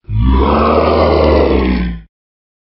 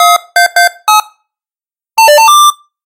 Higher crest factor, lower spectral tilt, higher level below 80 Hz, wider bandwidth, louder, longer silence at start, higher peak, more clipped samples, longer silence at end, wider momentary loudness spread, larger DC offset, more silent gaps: about the same, 12 dB vs 8 dB; first, -10.5 dB/octave vs 3.5 dB/octave; first, -18 dBFS vs -62 dBFS; second, 5.8 kHz vs over 20 kHz; second, -12 LUFS vs -7 LUFS; about the same, 0.1 s vs 0 s; about the same, 0 dBFS vs 0 dBFS; second, under 0.1% vs 0.6%; first, 0.75 s vs 0.3 s; about the same, 8 LU vs 7 LU; neither; neither